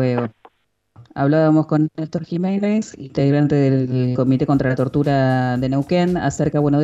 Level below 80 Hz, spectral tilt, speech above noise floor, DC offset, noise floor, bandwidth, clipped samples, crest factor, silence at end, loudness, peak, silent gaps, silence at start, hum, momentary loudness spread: -48 dBFS; -8 dB/octave; 41 dB; under 0.1%; -58 dBFS; 8 kHz; under 0.1%; 12 dB; 0 s; -18 LUFS; -6 dBFS; none; 0 s; none; 7 LU